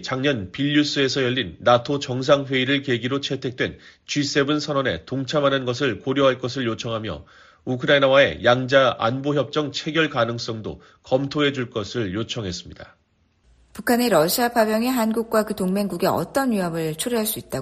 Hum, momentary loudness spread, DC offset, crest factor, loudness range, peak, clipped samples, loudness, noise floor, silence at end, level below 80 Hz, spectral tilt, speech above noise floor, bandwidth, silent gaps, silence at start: none; 10 LU; under 0.1%; 20 dB; 5 LU; -2 dBFS; under 0.1%; -21 LUFS; -64 dBFS; 0 s; -54 dBFS; -4.5 dB/octave; 42 dB; 14 kHz; none; 0 s